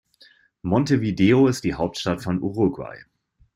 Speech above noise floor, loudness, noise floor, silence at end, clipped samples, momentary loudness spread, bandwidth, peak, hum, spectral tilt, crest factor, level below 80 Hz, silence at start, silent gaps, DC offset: 34 dB; -21 LUFS; -55 dBFS; 0.55 s; under 0.1%; 13 LU; 14.5 kHz; -6 dBFS; none; -6.5 dB/octave; 16 dB; -50 dBFS; 0.65 s; none; under 0.1%